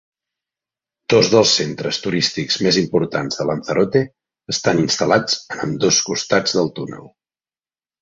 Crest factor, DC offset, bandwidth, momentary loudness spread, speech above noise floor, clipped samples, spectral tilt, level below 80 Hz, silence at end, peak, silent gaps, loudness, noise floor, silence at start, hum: 18 dB; under 0.1%; 8 kHz; 11 LU; over 72 dB; under 0.1%; -3.5 dB/octave; -56 dBFS; 0.95 s; -2 dBFS; none; -17 LUFS; under -90 dBFS; 1.1 s; none